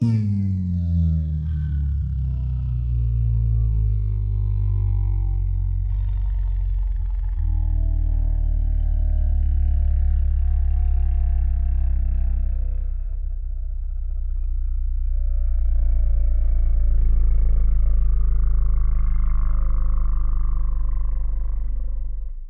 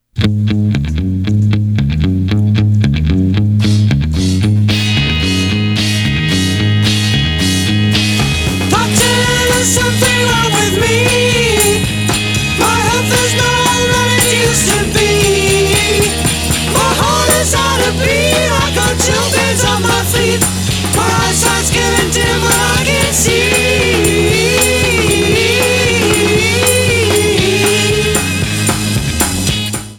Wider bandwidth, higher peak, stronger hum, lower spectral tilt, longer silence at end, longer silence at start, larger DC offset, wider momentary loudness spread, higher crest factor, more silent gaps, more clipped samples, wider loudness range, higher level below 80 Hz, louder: second, 2.2 kHz vs over 20 kHz; second, -10 dBFS vs 0 dBFS; neither; first, -11 dB/octave vs -3.5 dB/octave; about the same, 0 s vs 0 s; second, 0 s vs 0.15 s; neither; first, 7 LU vs 3 LU; about the same, 10 dB vs 12 dB; neither; neither; about the same, 4 LU vs 2 LU; first, -20 dBFS vs -26 dBFS; second, -24 LUFS vs -11 LUFS